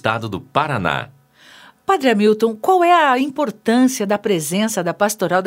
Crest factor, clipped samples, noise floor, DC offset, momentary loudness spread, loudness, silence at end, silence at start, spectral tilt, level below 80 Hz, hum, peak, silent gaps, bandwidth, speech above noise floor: 18 dB; under 0.1%; -46 dBFS; under 0.1%; 9 LU; -17 LUFS; 0 s; 0.05 s; -4.5 dB/octave; -58 dBFS; none; 0 dBFS; none; 16 kHz; 29 dB